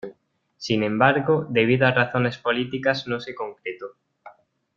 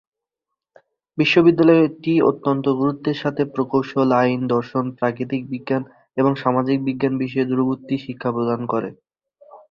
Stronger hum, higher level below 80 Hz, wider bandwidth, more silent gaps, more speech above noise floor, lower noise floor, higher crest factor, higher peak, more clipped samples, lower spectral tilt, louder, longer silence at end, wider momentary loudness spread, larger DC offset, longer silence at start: neither; about the same, -60 dBFS vs -62 dBFS; about the same, 7.4 kHz vs 6.8 kHz; neither; second, 35 dB vs 64 dB; second, -58 dBFS vs -83 dBFS; about the same, 22 dB vs 18 dB; about the same, -2 dBFS vs -2 dBFS; neither; second, -6.5 dB/octave vs -8 dB/octave; about the same, -22 LUFS vs -20 LUFS; first, 0.45 s vs 0.15 s; first, 17 LU vs 11 LU; neither; second, 0.05 s vs 1.15 s